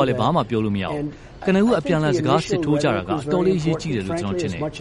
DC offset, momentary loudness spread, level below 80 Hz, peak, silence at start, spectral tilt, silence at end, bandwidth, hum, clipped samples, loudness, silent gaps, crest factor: under 0.1%; 7 LU; -44 dBFS; -4 dBFS; 0 s; -6.5 dB/octave; 0 s; 11.5 kHz; none; under 0.1%; -21 LUFS; none; 18 dB